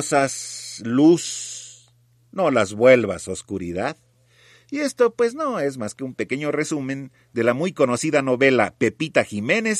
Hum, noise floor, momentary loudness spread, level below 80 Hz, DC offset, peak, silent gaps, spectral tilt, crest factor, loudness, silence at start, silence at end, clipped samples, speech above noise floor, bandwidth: none; -58 dBFS; 14 LU; -62 dBFS; under 0.1%; -2 dBFS; none; -4.5 dB/octave; 20 dB; -21 LUFS; 0 s; 0 s; under 0.1%; 37 dB; 14 kHz